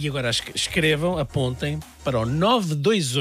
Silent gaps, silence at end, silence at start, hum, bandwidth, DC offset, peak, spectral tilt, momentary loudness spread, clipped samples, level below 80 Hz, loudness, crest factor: none; 0 s; 0 s; none; 15.5 kHz; under 0.1%; -6 dBFS; -4.5 dB/octave; 7 LU; under 0.1%; -44 dBFS; -23 LUFS; 18 dB